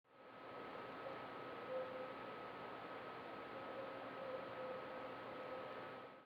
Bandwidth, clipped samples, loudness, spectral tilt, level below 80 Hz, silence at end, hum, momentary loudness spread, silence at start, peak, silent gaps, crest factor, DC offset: 19 kHz; under 0.1%; -50 LUFS; -6 dB/octave; -84 dBFS; 0 s; none; 4 LU; 0.05 s; -34 dBFS; none; 16 dB; under 0.1%